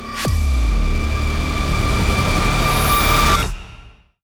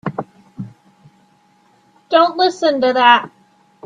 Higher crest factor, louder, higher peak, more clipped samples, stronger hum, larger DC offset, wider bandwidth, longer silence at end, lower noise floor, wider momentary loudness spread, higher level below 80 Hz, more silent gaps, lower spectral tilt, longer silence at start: about the same, 14 dB vs 18 dB; second, -18 LUFS vs -14 LUFS; second, -4 dBFS vs 0 dBFS; neither; neither; neither; first, over 20 kHz vs 9.4 kHz; second, 0.35 s vs 0.6 s; second, -43 dBFS vs -55 dBFS; second, 7 LU vs 23 LU; first, -20 dBFS vs -64 dBFS; neither; about the same, -4.5 dB/octave vs -4.5 dB/octave; about the same, 0 s vs 0.05 s